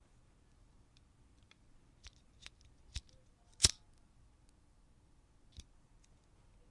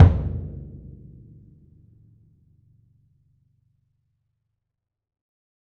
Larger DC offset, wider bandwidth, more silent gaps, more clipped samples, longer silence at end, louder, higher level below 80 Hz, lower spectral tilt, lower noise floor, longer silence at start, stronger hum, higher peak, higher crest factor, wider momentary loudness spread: neither; first, 11 kHz vs 3.8 kHz; neither; neither; second, 3 s vs 5 s; second, -34 LUFS vs -24 LUFS; second, -58 dBFS vs -36 dBFS; second, -0.5 dB/octave vs -10 dB/octave; second, -67 dBFS vs -79 dBFS; first, 2.95 s vs 0 s; neither; second, -8 dBFS vs 0 dBFS; first, 38 dB vs 26 dB; first, 29 LU vs 26 LU